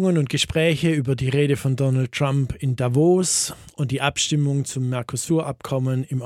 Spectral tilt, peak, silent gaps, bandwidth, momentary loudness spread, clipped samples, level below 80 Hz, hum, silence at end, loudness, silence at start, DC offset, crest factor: -5 dB/octave; -4 dBFS; none; 14.5 kHz; 7 LU; under 0.1%; -48 dBFS; none; 0 s; -21 LUFS; 0 s; under 0.1%; 16 dB